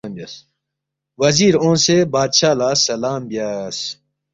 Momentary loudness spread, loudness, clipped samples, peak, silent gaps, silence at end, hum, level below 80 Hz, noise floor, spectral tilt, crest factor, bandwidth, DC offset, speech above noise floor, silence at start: 16 LU; -16 LUFS; under 0.1%; -2 dBFS; none; 0.4 s; none; -54 dBFS; -81 dBFS; -3.5 dB/octave; 16 dB; 8 kHz; under 0.1%; 64 dB; 0.05 s